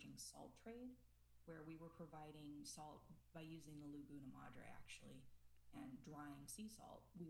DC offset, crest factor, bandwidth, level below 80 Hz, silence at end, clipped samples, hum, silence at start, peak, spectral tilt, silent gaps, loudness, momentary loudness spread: under 0.1%; 14 dB; 19.5 kHz; -74 dBFS; 0 s; under 0.1%; none; 0 s; -44 dBFS; -4.5 dB/octave; none; -59 LUFS; 7 LU